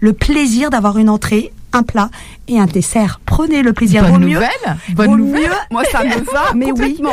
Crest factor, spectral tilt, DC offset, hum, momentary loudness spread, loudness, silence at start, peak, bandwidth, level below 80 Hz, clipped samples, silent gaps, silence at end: 12 dB; -5.5 dB/octave; under 0.1%; none; 7 LU; -13 LUFS; 0 s; 0 dBFS; 15.5 kHz; -26 dBFS; under 0.1%; none; 0 s